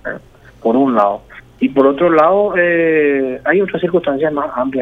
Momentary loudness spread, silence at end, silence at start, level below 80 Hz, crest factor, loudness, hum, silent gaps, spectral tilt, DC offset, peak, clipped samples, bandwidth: 9 LU; 0 s; 0.05 s; -48 dBFS; 14 dB; -14 LUFS; none; none; -8.5 dB/octave; under 0.1%; 0 dBFS; under 0.1%; 5.8 kHz